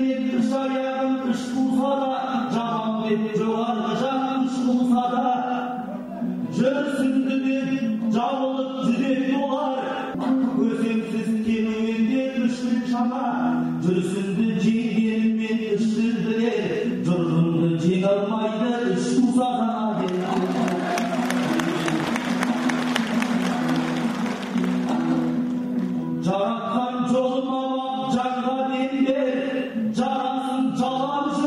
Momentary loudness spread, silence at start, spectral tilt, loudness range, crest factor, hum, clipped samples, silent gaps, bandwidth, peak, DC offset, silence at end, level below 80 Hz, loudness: 4 LU; 0 s; -6.5 dB/octave; 2 LU; 18 dB; none; under 0.1%; none; 12 kHz; -4 dBFS; under 0.1%; 0 s; -62 dBFS; -23 LUFS